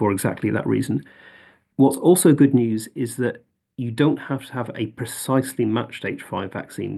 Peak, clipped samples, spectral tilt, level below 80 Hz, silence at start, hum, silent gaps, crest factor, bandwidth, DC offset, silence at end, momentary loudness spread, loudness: -4 dBFS; under 0.1%; -6 dB/octave; -64 dBFS; 0 s; none; none; 18 dB; 12.5 kHz; under 0.1%; 0 s; 15 LU; -21 LUFS